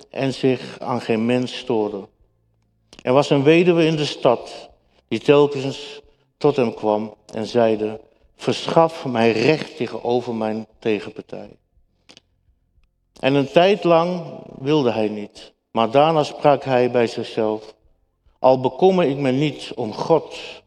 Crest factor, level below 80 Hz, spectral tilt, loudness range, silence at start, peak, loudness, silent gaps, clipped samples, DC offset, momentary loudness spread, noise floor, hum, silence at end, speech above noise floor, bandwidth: 20 dB; -60 dBFS; -6.5 dB/octave; 4 LU; 0.15 s; 0 dBFS; -19 LUFS; none; under 0.1%; under 0.1%; 14 LU; -64 dBFS; none; 0.05 s; 45 dB; 10.5 kHz